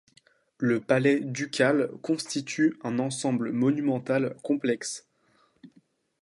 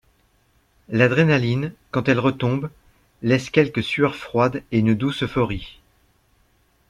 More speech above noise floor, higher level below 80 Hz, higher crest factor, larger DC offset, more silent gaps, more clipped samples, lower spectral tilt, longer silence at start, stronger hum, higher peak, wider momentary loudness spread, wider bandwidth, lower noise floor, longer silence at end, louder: about the same, 40 dB vs 42 dB; second, -74 dBFS vs -48 dBFS; about the same, 20 dB vs 20 dB; neither; neither; neither; second, -5 dB/octave vs -7 dB/octave; second, 0.6 s vs 0.9 s; neither; second, -8 dBFS vs -2 dBFS; about the same, 7 LU vs 9 LU; about the same, 11.5 kHz vs 11.5 kHz; first, -66 dBFS vs -62 dBFS; second, 0.55 s vs 1.2 s; second, -27 LUFS vs -21 LUFS